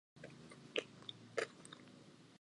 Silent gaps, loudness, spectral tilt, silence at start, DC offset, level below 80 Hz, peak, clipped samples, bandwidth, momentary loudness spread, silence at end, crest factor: none; -48 LUFS; -3 dB/octave; 0.15 s; under 0.1%; -86 dBFS; -22 dBFS; under 0.1%; 11.5 kHz; 16 LU; 0.05 s; 28 dB